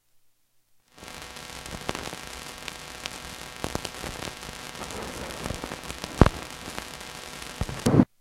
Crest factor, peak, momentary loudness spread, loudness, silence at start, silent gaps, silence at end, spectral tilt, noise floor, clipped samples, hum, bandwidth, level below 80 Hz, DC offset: 30 dB; 0 dBFS; 16 LU; -31 LUFS; 0.95 s; none; 0.15 s; -5 dB/octave; -63 dBFS; under 0.1%; none; 17 kHz; -38 dBFS; under 0.1%